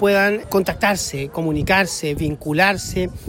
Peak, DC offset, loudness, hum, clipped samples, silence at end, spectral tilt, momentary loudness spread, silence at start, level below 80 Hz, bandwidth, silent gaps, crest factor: -4 dBFS; under 0.1%; -19 LUFS; none; under 0.1%; 0 s; -4.5 dB/octave; 7 LU; 0 s; -38 dBFS; 16.5 kHz; none; 16 dB